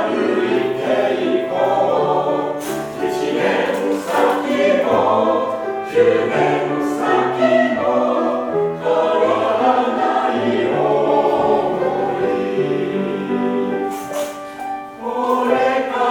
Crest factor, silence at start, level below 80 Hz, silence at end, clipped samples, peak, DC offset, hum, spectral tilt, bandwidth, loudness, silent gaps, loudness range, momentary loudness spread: 16 dB; 0 s; -58 dBFS; 0 s; under 0.1%; -2 dBFS; under 0.1%; none; -5.5 dB/octave; 20 kHz; -18 LUFS; none; 4 LU; 7 LU